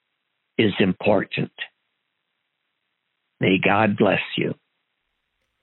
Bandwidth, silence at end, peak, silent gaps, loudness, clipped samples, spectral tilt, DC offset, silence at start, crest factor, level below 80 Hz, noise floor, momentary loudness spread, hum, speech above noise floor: 4.2 kHz; 1.1 s; -4 dBFS; none; -21 LUFS; under 0.1%; -4 dB/octave; under 0.1%; 0.6 s; 20 dB; -62 dBFS; -76 dBFS; 13 LU; none; 56 dB